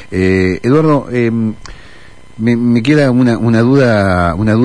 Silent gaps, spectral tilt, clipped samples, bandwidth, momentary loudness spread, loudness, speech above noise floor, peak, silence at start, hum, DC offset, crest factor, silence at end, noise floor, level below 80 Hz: none; -8 dB/octave; under 0.1%; 10.5 kHz; 6 LU; -12 LUFS; 29 dB; 0 dBFS; 0 s; none; 2%; 12 dB; 0 s; -40 dBFS; -38 dBFS